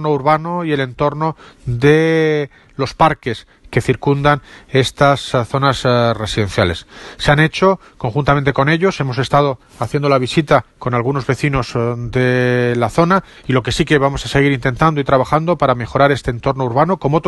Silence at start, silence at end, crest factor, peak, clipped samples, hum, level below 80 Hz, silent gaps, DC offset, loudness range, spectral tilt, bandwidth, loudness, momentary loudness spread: 0 s; 0 s; 16 dB; 0 dBFS; under 0.1%; none; -38 dBFS; none; under 0.1%; 2 LU; -6.5 dB/octave; 12 kHz; -15 LUFS; 8 LU